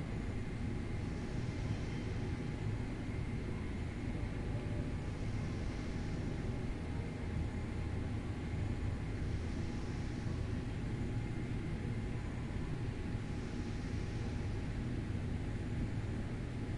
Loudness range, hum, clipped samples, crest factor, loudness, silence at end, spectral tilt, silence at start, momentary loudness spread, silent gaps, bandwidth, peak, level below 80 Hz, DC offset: 1 LU; none; under 0.1%; 12 dB; -41 LUFS; 0 s; -7.5 dB/octave; 0 s; 2 LU; none; 11.5 kHz; -26 dBFS; -46 dBFS; under 0.1%